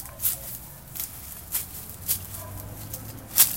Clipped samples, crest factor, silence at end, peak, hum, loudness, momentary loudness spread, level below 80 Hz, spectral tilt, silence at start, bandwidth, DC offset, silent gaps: under 0.1%; 30 dB; 0 s; 0 dBFS; none; -29 LUFS; 12 LU; -50 dBFS; -1 dB/octave; 0 s; 17 kHz; 0.1%; none